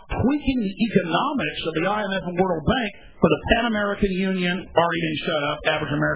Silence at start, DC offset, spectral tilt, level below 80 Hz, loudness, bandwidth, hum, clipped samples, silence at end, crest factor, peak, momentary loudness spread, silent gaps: 0.1 s; 0.4%; -10 dB/octave; -40 dBFS; -23 LUFS; 4 kHz; none; under 0.1%; 0 s; 20 dB; -2 dBFS; 4 LU; none